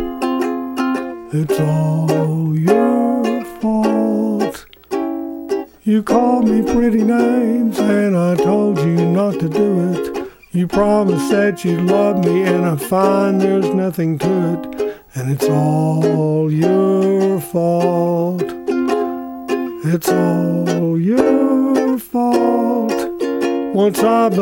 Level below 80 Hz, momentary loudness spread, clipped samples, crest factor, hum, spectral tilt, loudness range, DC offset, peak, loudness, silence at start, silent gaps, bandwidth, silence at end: -46 dBFS; 8 LU; under 0.1%; 16 dB; none; -7.5 dB/octave; 3 LU; under 0.1%; 0 dBFS; -16 LUFS; 0 s; none; 17.5 kHz; 0 s